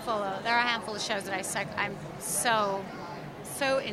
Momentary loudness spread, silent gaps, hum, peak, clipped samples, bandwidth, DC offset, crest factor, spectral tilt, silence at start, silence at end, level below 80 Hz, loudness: 13 LU; none; none; -10 dBFS; under 0.1%; 16 kHz; under 0.1%; 20 dB; -2.5 dB/octave; 0 s; 0 s; -62 dBFS; -30 LUFS